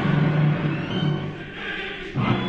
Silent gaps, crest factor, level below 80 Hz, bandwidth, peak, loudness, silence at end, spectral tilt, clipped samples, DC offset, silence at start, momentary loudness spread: none; 14 dB; -46 dBFS; 6.4 kHz; -10 dBFS; -24 LUFS; 0 s; -8 dB/octave; under 0.1%; under 0.1%; 0 s; 10 LU